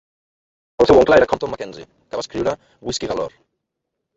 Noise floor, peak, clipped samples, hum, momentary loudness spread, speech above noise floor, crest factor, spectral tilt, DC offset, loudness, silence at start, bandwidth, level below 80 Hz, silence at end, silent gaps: -79 dBFS; -2 dBFS; under 0.1%; none; 18 LU; 61 dB; 18 dB; -5 dB/octave; under 0.1%; -18 LUFS; 0.8 s; 8 kHz; -44 dBFS; 0.9 s; none